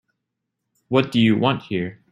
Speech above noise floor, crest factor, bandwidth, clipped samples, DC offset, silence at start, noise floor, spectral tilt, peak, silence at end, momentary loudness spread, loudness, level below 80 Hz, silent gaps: 60 dB; 20 dB; 10.5 kHz; under 0.1%; under 0.1%; 0.9 s; -80 dBFS; -7.5 dB/octave; -2 dBFS; 0.2 s; 10 LU; -20 LUFS; -58 dBFS; none